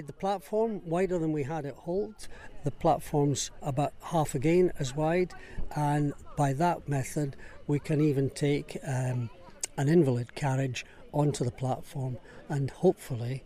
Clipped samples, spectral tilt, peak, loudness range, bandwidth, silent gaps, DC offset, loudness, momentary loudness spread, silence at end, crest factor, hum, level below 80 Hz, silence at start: under 0.1%; -6.5 dB/octave; -12 dBFS; 2 LU; 15 kHz; none; under 0.1%; -30 LUFS; 11 LU; 0 s; 16 dB; none; -48 dBFS; 0 s